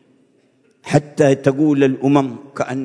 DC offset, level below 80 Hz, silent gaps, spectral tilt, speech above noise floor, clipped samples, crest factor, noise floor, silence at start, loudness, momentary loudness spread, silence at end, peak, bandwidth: under 0.1%; -58 dBFS; none; -7 dB/octave; 41 dB; under 0.1%; 18 dB; -57 dBFS; 0.85 s; -17 LUFS; 11 LU; 0 s; 0 dBFS; 10.5 kHz